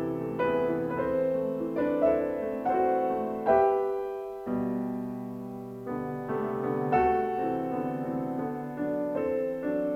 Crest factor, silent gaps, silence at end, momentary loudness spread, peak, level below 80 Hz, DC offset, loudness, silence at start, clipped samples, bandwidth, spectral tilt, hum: 18 dB; none; 0 s; 10 LU; -12 dBFS; -58 dBFS; under 0.1%; -29 LUFS; 0 s; under 0.1%; 15 kHz; -9 dB/octave; none